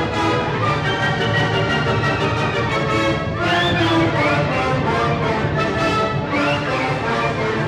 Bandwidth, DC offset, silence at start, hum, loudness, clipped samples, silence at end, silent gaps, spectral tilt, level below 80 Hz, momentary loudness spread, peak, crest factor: 11.5 kHz; under 0.1%; 0 s; none; -18 LUFS; under 0.1%; 0 s; none; -6 dB/octave; -38 dBFS; 3 LU; -8 dBFS; 12 dB